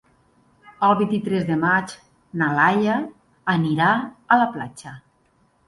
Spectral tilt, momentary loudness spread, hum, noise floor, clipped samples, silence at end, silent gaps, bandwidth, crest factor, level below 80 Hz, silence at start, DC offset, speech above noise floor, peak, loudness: -6.5 dB/octave; 17 LU; none; -62 dBFS; under 0.1%; 0.7 s; none; 11.5 kHz; 20 dB; -60 dBFS; 0.8 s; under 0.1%; 42 dB; -2 dBFS; -20 LUFS